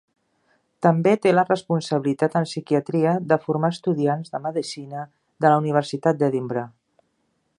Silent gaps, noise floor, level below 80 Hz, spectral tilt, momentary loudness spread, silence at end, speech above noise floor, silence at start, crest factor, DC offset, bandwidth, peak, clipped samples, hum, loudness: none; -71 dBFS; -70 dBFS; -7 dB/octave; 11 LU; 0.9 s; 49 dB; 0.8 s; 20 dB; under 0.1%; 11 kHz; -2 dBFS; under 0.1%; none; -22 LUFS